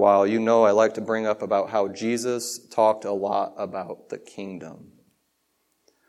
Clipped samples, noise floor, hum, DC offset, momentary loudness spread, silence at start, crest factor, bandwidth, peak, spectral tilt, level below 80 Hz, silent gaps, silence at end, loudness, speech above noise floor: under 0.1%; -72 dBFS; none; under 0.1%; 18 LU; 0 s; 18 dB; 14 kHz; -6 dBFS; -4.5 dB/octave; -76 dBFS; none; 1.35 s; -23 LUFS; 49 dB